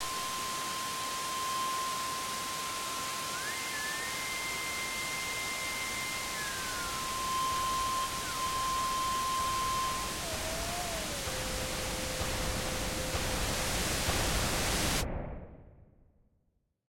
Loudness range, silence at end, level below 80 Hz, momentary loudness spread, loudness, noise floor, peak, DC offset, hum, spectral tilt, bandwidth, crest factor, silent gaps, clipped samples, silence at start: 2 LU; 1.15 s; -46 dBFS; 4 LU; -33 LUFS; -76 dBFS; -18 dBFS; under 0.1%; none; -2 dB/octave; 16.5 kHz; 16 dB; none; under 0.1%; 0 s